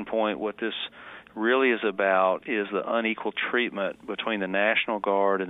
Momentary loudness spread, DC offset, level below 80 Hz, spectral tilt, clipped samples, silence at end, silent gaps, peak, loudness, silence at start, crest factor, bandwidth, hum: 9 LU; under 0.1%; -70 dBFS; -7 dB/octave; under 0.1%; 0 s; none; -8 dBFS; -26 LUFS; 0 s; 18 dB; 4 kHz; none